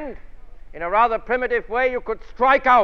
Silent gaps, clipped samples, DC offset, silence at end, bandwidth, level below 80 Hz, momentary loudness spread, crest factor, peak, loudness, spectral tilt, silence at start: none; under 0.1%; under 0.1%; 0 s; 6.6 kHz; -42 dBFS; 14 LU; 16 dB; -4 dBFS; -20 LUFS; -5.5 dB/octave; 0 s